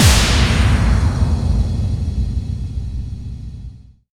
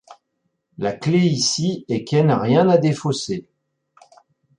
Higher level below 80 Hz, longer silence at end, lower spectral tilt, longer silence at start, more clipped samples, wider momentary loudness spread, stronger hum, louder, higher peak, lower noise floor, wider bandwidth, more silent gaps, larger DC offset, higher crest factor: first, -20 dBFS vs -60 dBFS; second, 0.35 s vs 1.15 s; about the same, -4.5 dB/octave vs -5.5 dB/octave; about the same, 0 s vs 0.1 s; neither; first, 17 LU vs 11 LU; neither; about the same, -18 LUFS vs -19 LUFS; about the same, 0 dBFS vs -2 dBFS; second, -36 dBFS vs -73 dBFS; first, 17 kHz vs 11 kHz; neither; neither; about the same, 16 dB vs 18 dB